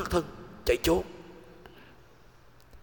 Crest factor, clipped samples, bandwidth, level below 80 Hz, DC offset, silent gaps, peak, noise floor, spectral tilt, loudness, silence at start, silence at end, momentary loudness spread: 22 dB; under 0.1%; 18 kHz; -46 dBFS; 0.1%; none; -12 dBFS; -57 dBFS; -5 dB/octave; -29 LUFS; 0 s; 0.05 s; 26 LU